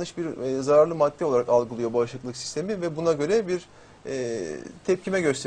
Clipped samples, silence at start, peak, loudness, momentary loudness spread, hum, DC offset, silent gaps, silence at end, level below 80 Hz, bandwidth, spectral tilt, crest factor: under 0.1%; 0 s; -8 dBFS; -25 LUFS; 12 LU; none; under 0.1%; none; 0 s; -60 dBFS; 10 kHz; -5.5 dB/octave; 18 dB